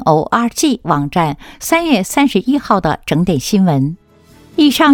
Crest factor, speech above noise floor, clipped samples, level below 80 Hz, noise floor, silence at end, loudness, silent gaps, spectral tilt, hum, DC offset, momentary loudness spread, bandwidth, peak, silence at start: 14 dB; 32 dB; under 0.1%; -42 dBFS; -45 dBFS; 0 s; -14 LUFS; none; -5 dB/octave; none; under 0.1%; 6 LU; 19 kHz; 0 dBFS; 0 s